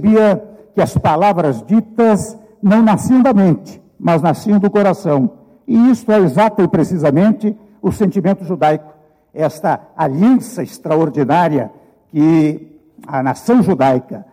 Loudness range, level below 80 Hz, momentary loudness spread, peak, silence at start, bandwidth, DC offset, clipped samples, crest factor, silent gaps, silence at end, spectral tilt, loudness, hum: 3 LU; -48 dBFS; 10 LU; -4 dBFS; 0 s; 15.5 kHz; under 0.1%; under 0.1%; 10 dB; none; 0.1 s; -8 dB/octave; -14 LUFS; none